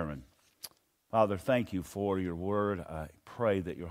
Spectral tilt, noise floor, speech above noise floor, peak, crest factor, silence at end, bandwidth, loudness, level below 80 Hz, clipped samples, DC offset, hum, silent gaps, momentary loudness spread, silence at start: -7 dB/octave; -53 dBFS; 21 dB; -12 dBFS; 20 dB; 0 s; 16 kHz; -33 LUFS; -58 dBFS; under 0.1%; under 0.1%; none; none; 19 LU; 0 s